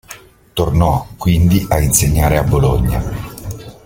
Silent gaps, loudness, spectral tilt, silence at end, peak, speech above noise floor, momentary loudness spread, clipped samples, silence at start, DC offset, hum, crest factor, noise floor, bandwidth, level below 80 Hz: none; -14 LUFS; -5.5 dB/octave; 0.15 s; 0 dBFS; 25 dB; 14 LU; under 0.1%; 0.1 s; under 0.1%; none; 14 dB; -39 dBFS; 17 kHz; -24 dBFS